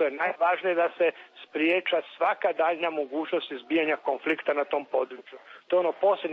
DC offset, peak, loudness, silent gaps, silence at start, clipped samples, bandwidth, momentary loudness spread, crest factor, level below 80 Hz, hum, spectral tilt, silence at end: under 0.1%; -12 dBFS; -27 LUFS; none; 0 s; under 0.1%; 5.4 kHz; 7 LU; 14 dB; -84 dBFS; none; -6 dB/octave; 0 s